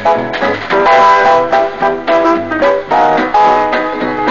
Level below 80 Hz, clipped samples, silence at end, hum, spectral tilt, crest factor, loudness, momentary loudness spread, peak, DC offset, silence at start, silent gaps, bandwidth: -44 dBFS; under 0.1%; 0 s; 50 Hz at -45 dBFS; -5 dB/octave; 10 dB; -11 LUFS; 8 LU; 0 dBFS; 1%; 0 s; none; 7.4 kHz